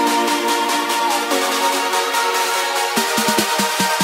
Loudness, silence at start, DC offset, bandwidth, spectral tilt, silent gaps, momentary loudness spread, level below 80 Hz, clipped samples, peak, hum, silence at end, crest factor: -17 LUFS; 0 s; under 0.1%; 16.5 kHz; -1.5 dB/octave; none; 1 LU; -64 dBFS; under 0.1%; -2 dBFS; none; 0 s; 16 dB